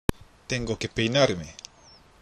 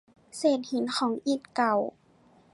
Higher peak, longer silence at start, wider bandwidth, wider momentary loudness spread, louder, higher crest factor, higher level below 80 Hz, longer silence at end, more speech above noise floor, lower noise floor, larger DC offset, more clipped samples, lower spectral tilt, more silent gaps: first, -4 dBFS vs -12 dBFS; second, 0.1 s vs 0.35 s; first, 13 kHz vs 11.5 kHz; first, 23 LU vs 5 LU; about the same, -26 LUFS vs -28 LUFS; first, 24 dB vs 18 dB; first, -42 dBFS vs -76 dBFS; about the same, 0.7 s vs 0.65 s; second, 28 dB vs 33 dB; second, -54 dBFS vs -60 dBFS; neither; neither; about the same, -4.5 dB/octave vs -4 dB/octave; neither